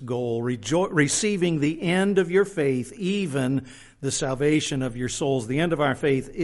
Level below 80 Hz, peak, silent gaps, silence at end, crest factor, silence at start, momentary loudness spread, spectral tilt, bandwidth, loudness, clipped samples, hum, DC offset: -50 dBFS; -6 dBFS; none; 0 s; 18 dB; 0 s; 6 LU; -5 dB/octave; 11.5 kHz; -24 LUFS; under 0.1%; none; under 0.1%